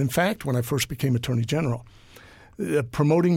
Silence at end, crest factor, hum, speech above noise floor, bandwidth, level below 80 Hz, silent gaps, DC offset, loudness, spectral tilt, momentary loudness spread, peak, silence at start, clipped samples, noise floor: 0 s; 14 dB; none; 26 dB; 17 kHz; -50 dBFS; none; under 0.1%; -25 LUFS; -6 dB/octave; 6 LU; -10 dBFS; 0 s; under 0.1%; -49 dBFS